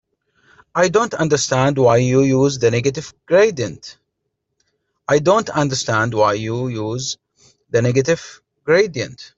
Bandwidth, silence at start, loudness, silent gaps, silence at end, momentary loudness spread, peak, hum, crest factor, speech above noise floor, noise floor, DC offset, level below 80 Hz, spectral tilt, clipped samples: 8 kHz; 0.75 s; -17 LUFS; none; 0.1 s; 12 LU; -2 dBFS; none; 16 dB; 58 dB; -75 dBFS; under 0.1%; -52 dBFS; -5 dB/octave; under 0.1%